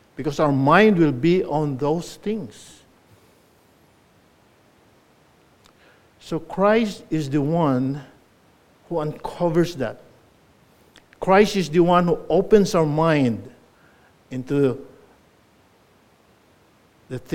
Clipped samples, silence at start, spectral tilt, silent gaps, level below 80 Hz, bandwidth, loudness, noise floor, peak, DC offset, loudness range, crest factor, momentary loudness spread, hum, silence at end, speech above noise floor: under 0.1%; 0.2 s; -7 dB/octave; none; -50 dBFS; 16 kHz; -20 LUFS; -57 dBFS; 0 dBFS; under 0.1%; 11 LU; 22 dB; 14 LU; none; 0 s; 37 dB